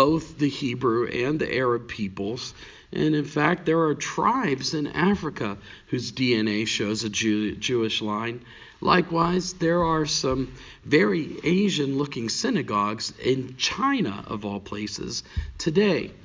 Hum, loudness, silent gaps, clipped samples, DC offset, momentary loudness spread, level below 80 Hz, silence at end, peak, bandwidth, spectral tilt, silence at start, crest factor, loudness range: none; -25 LUFS; none; under 0.1%; under 0.1%; 10 LU; -46 dBFS; 0 s; -6 dBFS; 7.6 kHz; -5 dB/octave; 0 s; 20 dB; 2 LU